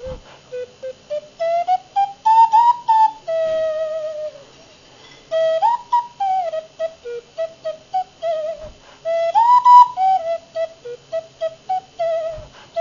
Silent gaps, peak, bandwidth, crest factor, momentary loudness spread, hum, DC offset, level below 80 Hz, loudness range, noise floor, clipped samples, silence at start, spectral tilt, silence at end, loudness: none; 0 dBFS; 7.4 kHz; 18 dB; 20 LU; none; under 0.1%; -52 dBFS; 7 LU; -46 dBFS; under 0.1%; 0 s; -3 dB/octave; 0 s; -18 LUFS